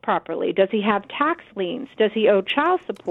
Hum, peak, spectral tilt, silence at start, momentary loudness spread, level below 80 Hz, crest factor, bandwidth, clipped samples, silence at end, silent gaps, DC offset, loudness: none; -6 dBFS; -7 dB/octave; 0.05 s; 9 LU; -66 dBFS; 16 dB; 4.2 kHz; under 0.1%; 0 s; none; under 0.1%; -22 LUFS